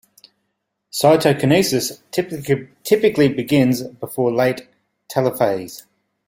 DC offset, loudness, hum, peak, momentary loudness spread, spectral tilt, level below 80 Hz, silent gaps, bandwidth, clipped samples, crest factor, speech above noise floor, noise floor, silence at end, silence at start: under 0.1%; -18 LUFS; none; -2 dBFS; 12 LU; -5.5 dB/octave; -56 dBFS; none; 16.5 kHz; under 0.1%; 18 dB; 56 dB; -74 dBFS; 0.5 s; 0.95 s